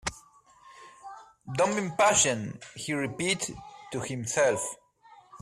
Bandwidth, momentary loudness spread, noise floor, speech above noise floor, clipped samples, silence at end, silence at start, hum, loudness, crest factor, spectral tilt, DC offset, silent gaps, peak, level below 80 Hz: 14 kHz; 24 LU; -57 dBFS; 29 dB; under 0.1%; 0 s; 0.05 s; none; -28 LUFS; 20 dB; -3 dB/octave; under 0.1%; none; -10 dBFS; -60 dBFS